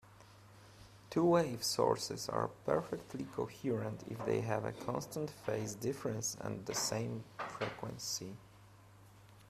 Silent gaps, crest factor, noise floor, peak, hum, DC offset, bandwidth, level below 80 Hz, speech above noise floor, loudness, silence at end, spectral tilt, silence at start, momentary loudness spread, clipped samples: none; 22 dB; -60 dBFS; -16 dBFS; none; under 0.1%; 15.5 kHz; -68 dBFS; 22 dB; -38 LUFS; 0 s; -4.5 dB/octave; 0.05 s; 11 LU; under 0.1%